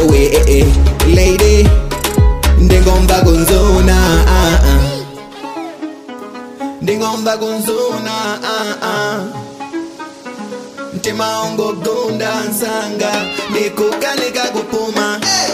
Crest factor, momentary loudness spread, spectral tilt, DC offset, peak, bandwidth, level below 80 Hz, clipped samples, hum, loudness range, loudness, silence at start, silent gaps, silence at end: 12 dB; 17 LU; -5 dB/octave; under 0.1%; 0 dBFS; 16 kHz; -16 dBFS; under 0.1%; none; 10 LU; -13 LUFS; 0 s; none; 0 s